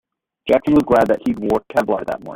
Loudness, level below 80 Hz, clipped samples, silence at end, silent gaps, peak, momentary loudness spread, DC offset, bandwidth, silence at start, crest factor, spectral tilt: -17 LUFS; -46 dBFS; under 0.1%; 0 s; none; -2 dBFS; 8 LU; under 0.1%; 16 kHz; 0.45 s; 16 dB; -7 dB/octave